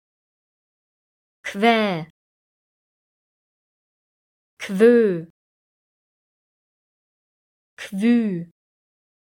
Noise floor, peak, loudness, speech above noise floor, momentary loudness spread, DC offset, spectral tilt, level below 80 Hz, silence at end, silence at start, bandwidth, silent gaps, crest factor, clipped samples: under -90 dBFS; -4 dBFS; -19 LUFS; over 72 dB; 20 LU; under 0.1%; -6 dB/octave; -72 dBFS; 0.85 s; 1.45 s; 15 kHz; 2.10-4.57 s, 5.30-7.77 s; 20 dB; under 0.1%